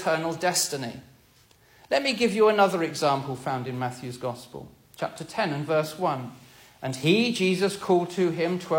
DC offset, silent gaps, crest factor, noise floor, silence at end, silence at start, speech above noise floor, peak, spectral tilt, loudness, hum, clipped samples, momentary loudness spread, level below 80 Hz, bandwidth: under 0.1%; none; 18 dB; -58 dBFS; 0 s; 0 s; 33 dB; -8 dBFS; -4.5 dB/octave; -26 LUFS; none; under 0.1%; 13 LU; -66 dBFS; 16.5 kHz